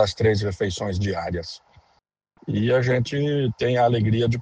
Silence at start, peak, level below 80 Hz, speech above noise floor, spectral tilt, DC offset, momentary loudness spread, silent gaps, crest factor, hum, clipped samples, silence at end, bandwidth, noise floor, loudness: 0 s; -6 dBFS; -48 dBFS; 36 dB; -6.5 dB/octave; under 0.1%; 11 LU; none; 16 dB; none; under 0.1%; 0 s; 9.2 kHz; -58 dBFS; -23 LUFS